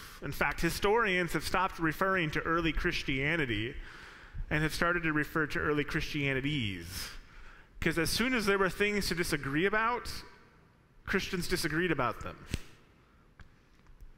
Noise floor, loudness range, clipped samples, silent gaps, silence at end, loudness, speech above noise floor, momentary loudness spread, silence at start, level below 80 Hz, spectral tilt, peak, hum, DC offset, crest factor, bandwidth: -62 dBFS; 5 LU; under 0.1%; none; 0.05 s; -31 LUFS; 30 dB; 14 LU; 0 s; -46 dBFS; -4.5 dB/octave; -12 dBFS; none; under 0.1%; 20 dB; 16 kHz